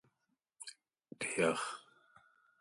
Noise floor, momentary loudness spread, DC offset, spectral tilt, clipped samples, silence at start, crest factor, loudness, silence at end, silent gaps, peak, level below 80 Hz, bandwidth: -84 dBFS; 18 LU; under 0.1%; -3.5 dB/octave; under 0.1%; 0.6 s; 24 dB; -36 LUFS; 0.8 s; none; -18 dBFS; -80 dBFS; 11.5 kHz